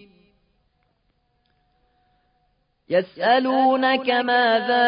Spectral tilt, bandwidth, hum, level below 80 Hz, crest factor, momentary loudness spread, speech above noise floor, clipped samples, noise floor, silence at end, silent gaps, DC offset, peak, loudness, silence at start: -8.5 dB/octave; 5.2 kHz; none; -70 dBFS; 16 dB; 6 LU; 49 dB; under 0.1%; -68 dBFS; 0 s; none; under 0.1%; -6 dBFS; -19 LUFS; 2.9 s